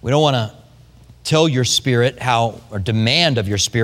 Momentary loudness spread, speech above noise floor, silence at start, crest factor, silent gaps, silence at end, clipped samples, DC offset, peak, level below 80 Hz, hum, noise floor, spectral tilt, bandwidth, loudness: 8 LU; 29 dB; 0.05 s; 18 dB; none; 0 s; under 0.1%; under 0.1%; 0 dBFS; -46 dBFS; none; -45 dBFS; -4.5 dB/octave; 15.5 kHz; -17 LUFS